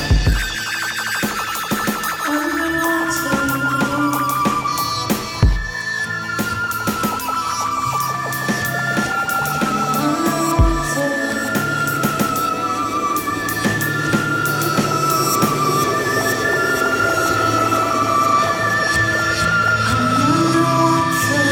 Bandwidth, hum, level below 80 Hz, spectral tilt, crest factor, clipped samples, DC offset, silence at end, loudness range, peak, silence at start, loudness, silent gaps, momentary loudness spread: 17.5 kHz; none; -30 dBFS; -4 dB/octave; 16 dB; under 0.1%; under 0.1%; 0 s; 4 LU; -2 dBFS; 0 s; -18 LUFS; none; 5 LU